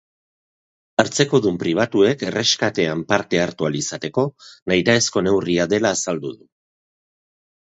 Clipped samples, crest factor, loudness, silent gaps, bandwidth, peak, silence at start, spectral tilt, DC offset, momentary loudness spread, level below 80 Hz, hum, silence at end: under 0.1%; 20 dB; -19 LUFS; 4.62-4.66 s; 8.2 kHz; 0 dBFS; 1 s; -4 dB/octave; under 0.1%; 7 LU; -54 dBFS; none; 1.4 s